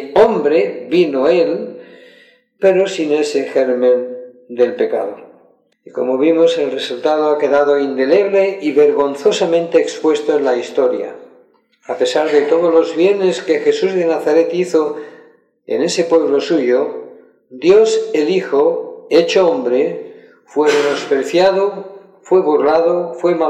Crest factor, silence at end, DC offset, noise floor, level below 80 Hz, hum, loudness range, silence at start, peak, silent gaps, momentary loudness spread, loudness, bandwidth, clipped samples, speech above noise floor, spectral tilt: 14 dB; 0 s; under 0.1%; -52 dBFS; -60 dBFS; none; 3 LU; 0 s; 0 dBFS; none; 10 LU; -14 LUFS; 9.4 kHz; under 0.1%; 38 dB; -5 dB/octave